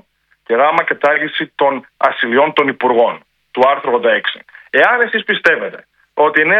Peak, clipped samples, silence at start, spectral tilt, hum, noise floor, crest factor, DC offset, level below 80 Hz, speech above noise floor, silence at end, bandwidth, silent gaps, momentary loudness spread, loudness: 0 dBFS; under 0.1%; 0.5 s; -5.5 dB/octave; none; -41 dBFS; 14 dB; under 0.1%; -66 dBFS; 28 dB; 0 s; 8 kHz; none; 8 LU; -14 LUFS